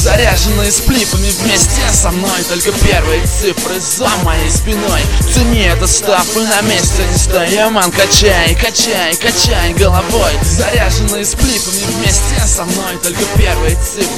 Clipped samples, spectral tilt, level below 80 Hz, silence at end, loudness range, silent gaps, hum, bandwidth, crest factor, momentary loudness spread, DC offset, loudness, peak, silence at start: 0.1%; -3 dB/octave; -16 dBFS; 0 s; 2 LU; none; none; 18.5 kHz; 12 dB; 4 LU; 2%; -11 LUFS; 0 dBFS; 0 s